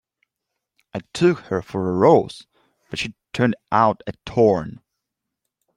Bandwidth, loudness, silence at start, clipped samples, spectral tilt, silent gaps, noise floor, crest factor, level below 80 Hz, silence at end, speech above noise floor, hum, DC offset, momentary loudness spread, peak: 11 kHz; -20 LUFS; 0.95 s; under 0.1%; -6.5 dB/octave; none; -81 dBFS; 20 dB; -56 dBFS; 1 s; 62 dB; none; under 0.1%; 18 LU; -2 dBFS